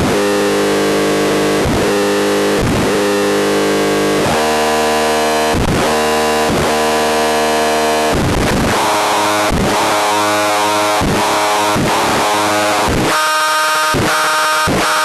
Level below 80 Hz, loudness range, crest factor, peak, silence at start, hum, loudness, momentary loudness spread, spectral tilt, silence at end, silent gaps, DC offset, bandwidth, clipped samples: -32 dBFS; 1 LU; 8 dB; -6 dBFS; 0 s; none; -13 LUFS; 1 LU; -3.5 dB/octave; 0 s; none; under 0.1%; 13 kHz; under 0.1%